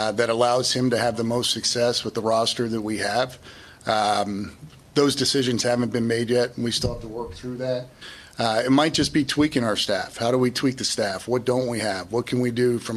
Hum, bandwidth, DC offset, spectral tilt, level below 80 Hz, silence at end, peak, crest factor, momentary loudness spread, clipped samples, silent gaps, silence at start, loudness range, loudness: none; 14 kHz; under 0.1%; -4 dB/octave; -50 dBFS; 0 s; -6 dBFS; 18 dB; 10 LU; under 0.1%; none; 0 s; 2 LU; -23 LUFS